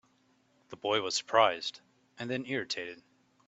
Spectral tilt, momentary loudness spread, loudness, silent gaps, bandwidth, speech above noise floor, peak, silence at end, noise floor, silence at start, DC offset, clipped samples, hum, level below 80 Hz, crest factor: -3 dB/octave; 18 LU; -31 LUFS; none; 8.4 kHz; 38 dB; -10 dBFS; 0.55 s; -69 dBFS; 0.7 s; under 0.1%; under 0.1%; none; -78 dBFS; 24 dB